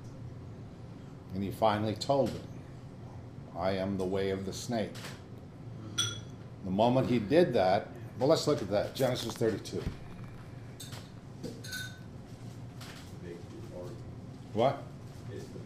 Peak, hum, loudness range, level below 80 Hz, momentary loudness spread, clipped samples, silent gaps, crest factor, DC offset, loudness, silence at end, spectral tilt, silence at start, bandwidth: -12 dBFS; none; 14 LU; -58 dBFS; 19 LU; under 0.1%; none; 22 dB; under 0.1%; -32 LUFS; 0 s; -5.5 dB/octave; 0 s; 15.5 kHz